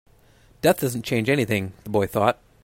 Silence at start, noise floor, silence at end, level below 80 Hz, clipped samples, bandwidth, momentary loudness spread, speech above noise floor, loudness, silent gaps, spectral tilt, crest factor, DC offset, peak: 0.65 s; -55 dBFS; 0.3 s; -54 dBFS; under 0.1%; 16.5 kHz; 4 LU; 33 dB; -23 LUFS; none; -5.5 dB/octave; 20 dB; under 0.1%; -4 dBFS